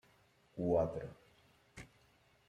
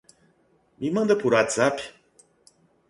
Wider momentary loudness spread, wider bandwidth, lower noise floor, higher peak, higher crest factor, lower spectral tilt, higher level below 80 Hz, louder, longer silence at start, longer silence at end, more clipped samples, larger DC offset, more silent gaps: first, 24 LU vs 14 LU; first, 13 kHz vs 11.5 kHz; first, -70 dBFS vs -64 dBFS; second, -22 dBFS vs -6 dBFS; about the same, 20 dB vs 20 dB; first, -8.5 dB/octave vs -4.5 dB/octave; about the same, -64 dBFS vs -66 dBFS; second, -37 LUFS vs -23 LUFS; second, 0.55 s vs 0.8 s; second, 0.65 s vs 1 s; neither; neither; neither